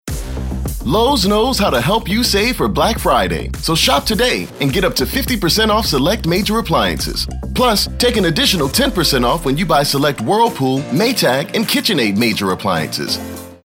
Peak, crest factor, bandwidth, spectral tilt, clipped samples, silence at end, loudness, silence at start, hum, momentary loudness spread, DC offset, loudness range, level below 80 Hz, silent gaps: -2 dBFS; 12 dB; 16.5 kHz; -4 dB/octave; under 0.1%; 0.1 s; -15 LUFS; 0.05 s; none; 7 LU; under 0.1%; 1 LU; -28 dBFS; none